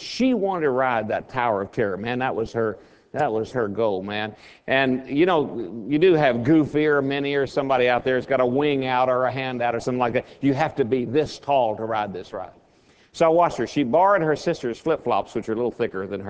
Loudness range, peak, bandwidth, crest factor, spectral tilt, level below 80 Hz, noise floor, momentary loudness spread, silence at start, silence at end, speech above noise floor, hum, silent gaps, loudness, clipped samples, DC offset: 4 LU; -4 dBFS; 8 kHz; 18 dB; -6.5 dB/octave; -56 dBFS; -57 dBFS; 9 LU; 0 s; 0 s; 35 dB; none; none; -22 LUFS; under 0.1%; under 0.1%